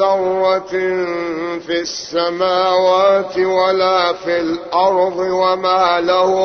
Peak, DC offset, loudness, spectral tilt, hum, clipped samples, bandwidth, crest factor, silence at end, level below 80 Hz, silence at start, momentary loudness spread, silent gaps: -2 dBFS; under 0.1%; -16 LUFS; -4 dB/octave; none; under 0.1%; 6.6 kHz; 14 dB; 0 s; -54 dBFS; 0 s; 7 LU; none